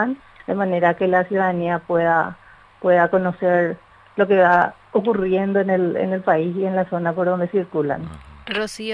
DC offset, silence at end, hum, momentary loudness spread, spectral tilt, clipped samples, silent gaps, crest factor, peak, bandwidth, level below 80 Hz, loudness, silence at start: under 0.1%; 0 s; none; 10 LU; -7 dB/octave; under 0.1%; none; 18 dB; -2 dBFS; 11 kHz; -54 dBFS; -20 LUFS; 0 s